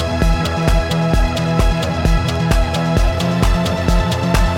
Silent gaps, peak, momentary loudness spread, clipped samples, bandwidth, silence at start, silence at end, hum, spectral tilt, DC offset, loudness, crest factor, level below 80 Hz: none; -2 dBFS; 1 LU; under 0.1%; 16.5 kHz; 0 s; 0 s; none; -6 dB/octave; under 0.1%; -17 LUFS; 12 dB; -18 dBFS